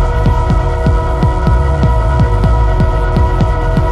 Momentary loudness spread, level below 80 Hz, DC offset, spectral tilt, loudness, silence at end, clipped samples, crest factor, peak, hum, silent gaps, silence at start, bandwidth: 2 LU; -12 dBFS; under 0.1%; -8 dB/octave; -13 LUFS; 0 s; under 0.1%; 10 dB; 0 dBFS; none; none; 0 s; 9 kHz